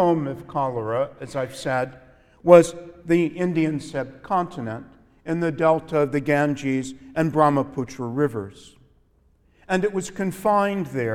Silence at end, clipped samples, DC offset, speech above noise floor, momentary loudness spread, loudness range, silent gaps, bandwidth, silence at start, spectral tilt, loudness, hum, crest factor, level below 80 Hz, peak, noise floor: 0 s; under 0.1%; under 0.1%; 38 dB; 11 LU; 4 LU; none; 15 kHz; 0 s; -6.5 dB/octave; -23 LUFS; none; 22 dB; -56 dBFS; 0 dBFS; -60 dBFS